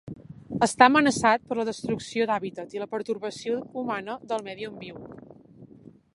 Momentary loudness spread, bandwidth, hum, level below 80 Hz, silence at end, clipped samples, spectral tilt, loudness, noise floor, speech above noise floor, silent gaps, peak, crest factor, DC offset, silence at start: 22 LU; 11.5 kHz; none; -62 dBFS; 0.5 s; under 0.1%; -4 dB/octave; -25 LUFS; -51 dBFS; 25 dB; none; -2 dBFS; 26 dB; under 0.1%; 0.05 s